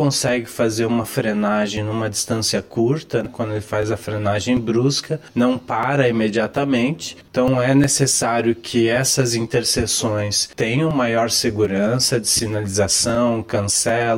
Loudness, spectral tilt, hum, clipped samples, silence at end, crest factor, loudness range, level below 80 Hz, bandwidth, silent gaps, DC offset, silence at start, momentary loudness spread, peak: -19 LUFS; -4 dB/octave; none; under 0.1%; 0 s; 16 dB; 3 LU; -48 dBFS; 16.5 kHz; none; under 0.1%; 0 s; 7 LU; -4 dBFS